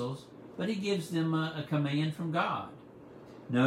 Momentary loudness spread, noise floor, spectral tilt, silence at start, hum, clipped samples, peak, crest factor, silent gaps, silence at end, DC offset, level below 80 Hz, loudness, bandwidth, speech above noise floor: 19 LU; -51 dBFS; -6.5 dB/octave; 0 s; none; under 0.1%; -14 dBFS; 18 dB; none; 0 s; under 0.1%; -72 dBFS; -33 LUFS; 14.5 kHz; 19 dB